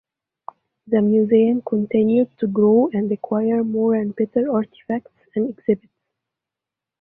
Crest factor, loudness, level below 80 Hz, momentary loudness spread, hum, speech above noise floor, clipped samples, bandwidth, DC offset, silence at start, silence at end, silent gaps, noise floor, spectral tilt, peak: 14 dB; -20 LUFS; -64 dBFS; 9 LU; none; 68 dB; under 0.1%; 3.9 kHz; under 0.1%; 0.85 s; 1.25 s; none; -87 dBFS; -12 dB/octave; -6 dBFS